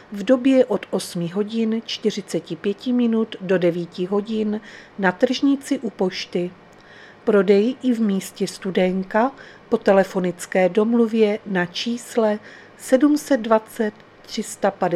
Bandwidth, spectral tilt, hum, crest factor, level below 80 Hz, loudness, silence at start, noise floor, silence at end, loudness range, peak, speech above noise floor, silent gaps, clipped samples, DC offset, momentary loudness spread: 14.5 kHz; -5.5 dB/octave; none; 20 dB; -62 dBFS; -21 LUFS; 0.1 s; -45 dBFS; 0 s; 3 LU; -2 dBFS; 25 dB; none; under 0.1%; under 0.1%; 10 LU